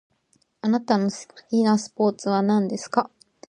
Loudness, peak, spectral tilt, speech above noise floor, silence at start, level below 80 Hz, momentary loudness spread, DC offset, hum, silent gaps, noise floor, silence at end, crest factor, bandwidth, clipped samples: -23 LUFS; -4 dBFS; -6 dB/octave; 44 dB; 0.65 s; -72 dBFS; 8 LU; under 0.1%; none; none; -66 dBFS; 0.45 s; 20 dB; 9.8 kHz; under 0.1%